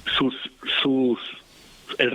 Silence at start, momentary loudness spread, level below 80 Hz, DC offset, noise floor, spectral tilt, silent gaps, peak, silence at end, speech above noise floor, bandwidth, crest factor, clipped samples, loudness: 0.05 s; 14 LU; -56 dBFS; under 0.1%; -46 dBFS; -5 dB/octave; none; -4 dBFS; 0 s; 22 dB; 11.5 kHz; 20 dB; under 0.1%; -24 LUFS